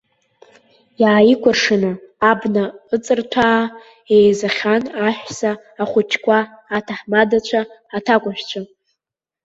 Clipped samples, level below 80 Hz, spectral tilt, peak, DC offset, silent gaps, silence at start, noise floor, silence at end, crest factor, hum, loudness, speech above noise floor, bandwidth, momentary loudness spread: under 0.1%; -56 dBFS; -5 dB/octave; -2 dBFS; under 0.1%; none; 1 s; -84 dBFS; 0.8 s; 16 dB; none; -17 LUFS; 67 dB; 8 kHz; 12 LU